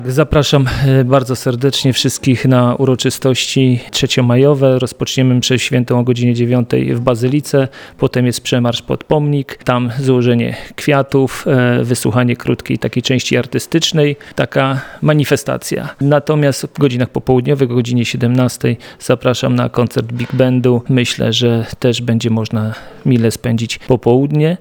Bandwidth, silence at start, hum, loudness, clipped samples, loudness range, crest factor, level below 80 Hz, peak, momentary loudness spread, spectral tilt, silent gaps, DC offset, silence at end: 19 kHz; 0 s; none; -14 LUFS; under 0.1%; 2 LU; 14 dB; -40 dBFS; 0 dBFS; 6 LU; -6 dB/octave; none; under 0.1%; 0.05 s